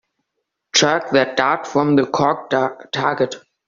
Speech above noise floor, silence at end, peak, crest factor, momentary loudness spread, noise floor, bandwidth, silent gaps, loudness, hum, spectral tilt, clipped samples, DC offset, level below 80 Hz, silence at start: 59 dB; 0.3 s; -2 dBFS; 18 dB; 6 LU; -77 dBFS; 7.6 kHz; none; -18 LUFS; none; -3 dB/octave; under 0.1%; under 0.1%; -58 dBFS; 0.75 s